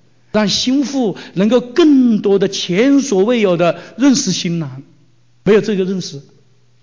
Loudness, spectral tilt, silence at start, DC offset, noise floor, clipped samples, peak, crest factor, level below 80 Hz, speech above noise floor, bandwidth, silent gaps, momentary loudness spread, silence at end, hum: -14 LUFS; -5 dB/octave; 0.35 s; 0.3%; -54 dBFS; under 0.1%; -2 dBFS; 12 dB; -54 dBFS; 40 dB; 7.6 kHz; none; 9 LU; 0.6 s; none